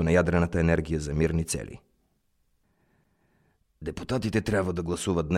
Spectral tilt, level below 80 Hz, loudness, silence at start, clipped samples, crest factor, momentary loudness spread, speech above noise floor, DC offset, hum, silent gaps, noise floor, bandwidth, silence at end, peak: -6 dB/octave; -42 dBFS; -27 LUFS; 0 s; under 0.1%; 18 dB; 13 LU; 45 dB; under 0.1%; none; none; -71 dBFS; 13.5 kHz; 0 s; -10 dBFS